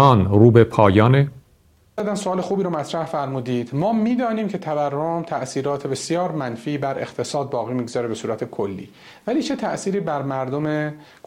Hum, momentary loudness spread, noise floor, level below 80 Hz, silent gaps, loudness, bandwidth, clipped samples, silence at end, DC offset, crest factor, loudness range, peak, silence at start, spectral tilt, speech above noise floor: none; 13 LU; -56 dBFS; -54 dBFS; none; -21 LUFS; 12 kHz; under 0.1%; 0.25 s; under 0.1%; 20 dB; 7 LU; 0 dBFS; 0 s; -7 dB/octave; 36 dB